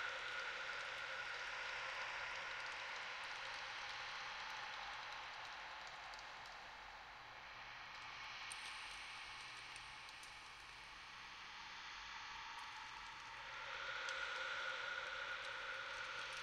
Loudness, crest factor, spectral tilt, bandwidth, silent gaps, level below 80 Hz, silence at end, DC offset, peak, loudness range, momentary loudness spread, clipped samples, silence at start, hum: -48 LUFS; 18 dB; -0.5 dB/octave; 15.5 kHz; none; -74 dBFS; 0 s; under 0.1%; -32 dBFS; 6 LU; 9 LU; under 0.1%; 0 s; none